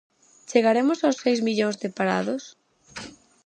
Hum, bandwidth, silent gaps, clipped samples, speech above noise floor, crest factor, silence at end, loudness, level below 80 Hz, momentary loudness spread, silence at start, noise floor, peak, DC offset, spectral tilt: none; 10 kHz; none; under 0.1%; 19 dB; 20 dB; 0.35 s; -23 LUFS; -70 dBFS; 19 LU; 0.5 s; -42 dBFS; -4 dBFS; under 0.1%; -5 dB/octave